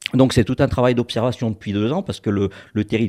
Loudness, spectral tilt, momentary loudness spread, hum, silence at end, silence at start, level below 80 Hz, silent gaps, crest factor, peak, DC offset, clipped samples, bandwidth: -20 LUFS; -6.5 dB/octave; 7 LU; none; 0 s; 0 s; -42 dBFS; none; 18 dB; -2 dBFS; under 0.1%; under 0.1%; 14.5 kHz